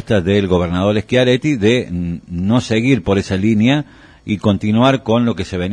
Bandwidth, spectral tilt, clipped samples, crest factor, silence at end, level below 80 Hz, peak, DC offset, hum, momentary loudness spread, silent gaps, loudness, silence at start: 10 kHz; -6.5 dB/octave; under 0.1%; 14 dB; 0 s; -40 dBFS; -2 dBFS; under 0.1%; none; 9 LU; none; -15 LUFS; 0 s